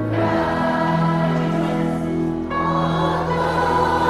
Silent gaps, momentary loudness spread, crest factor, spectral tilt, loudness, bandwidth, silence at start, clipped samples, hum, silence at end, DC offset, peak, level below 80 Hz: none; 4 LU; 14 dB; -7.5 dB/octave; -20 LUFS; 12 kHz; 0 s; under 0.1%; none; 0 s; under 0.1%; -4 dBFS; -40 dBFS